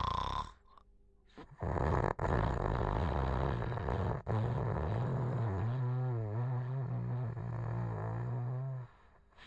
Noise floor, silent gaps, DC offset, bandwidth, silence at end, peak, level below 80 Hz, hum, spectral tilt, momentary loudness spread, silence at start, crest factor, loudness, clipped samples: -64 dBFS; none; under 0.1%; 7.6 kHz; 0 s; -18 dBFS; -46 dBFS; none; -8.5 dB/octave; 7 LU; 0 s; 18 dB; -37 LUFS; under 0.1%